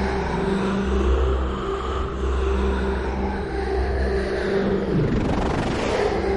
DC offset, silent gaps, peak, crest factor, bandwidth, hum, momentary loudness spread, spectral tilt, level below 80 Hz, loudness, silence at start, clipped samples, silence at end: 0.1%; none; -10 dBFS; 12 dB; 10.5 kHz; none; 4 LU; -7 dB/octave; -26 dBFS; -23 LUFS; 0 s; under 0.1%; 0 s